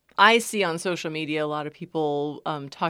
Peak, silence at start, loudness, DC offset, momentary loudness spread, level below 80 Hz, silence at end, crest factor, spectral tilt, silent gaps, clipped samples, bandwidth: -2 dBFS; 0.2 s; -24 LUFS; under 0.1%; 14 LU; -74 dBFS; 0 s; 22 dB; -3.5 dB/octave; none; under 0.1%; 16.5 kHz